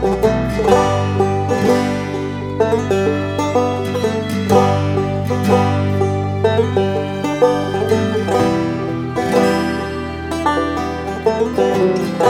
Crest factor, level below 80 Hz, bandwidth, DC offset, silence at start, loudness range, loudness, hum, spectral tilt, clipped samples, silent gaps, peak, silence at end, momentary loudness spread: 16 dB; -38 dBFS; 16.5 kHz; under 0.1%; 0 s; 1 LU; -17 LUFS; none; -6.5 dB/octave; under 0.1%; none; 0 dBFS; 0 s; 6 LU